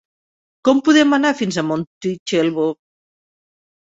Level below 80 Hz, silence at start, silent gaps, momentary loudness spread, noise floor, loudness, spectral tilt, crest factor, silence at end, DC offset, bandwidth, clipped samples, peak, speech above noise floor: -62 dBFS; 0.65 s; 1.87-2.01 s, 2.19-2.26 s; 11 LU; under -90 dBFS; -17 LUFS; -5 dB/octave; 18 dB; 1.15 s; under 0.1%; 8 kHz; under 0.1%; -2 dBFS; over 74 dB